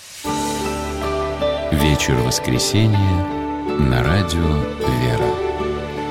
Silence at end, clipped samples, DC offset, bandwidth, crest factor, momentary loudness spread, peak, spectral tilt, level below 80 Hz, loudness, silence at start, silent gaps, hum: 0 s; under 0.1%; under 0.1%; 16.5 kHz; 14 dB; 7 LU; -4 dBFS; -5 dB/octave; -30 dBFS; -19 LUFS; 0 s; none; none